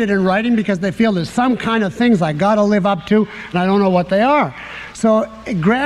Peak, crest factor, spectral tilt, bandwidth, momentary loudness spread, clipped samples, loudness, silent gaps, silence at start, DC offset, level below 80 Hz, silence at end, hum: -2 dBFS; 12 dB; -6.5 dB/octave; 11.5 kHz; 5 LU; under 0.1%; -16 LUFS; none; 0 s; under 0.1%; -48 dBFS; 0 s; none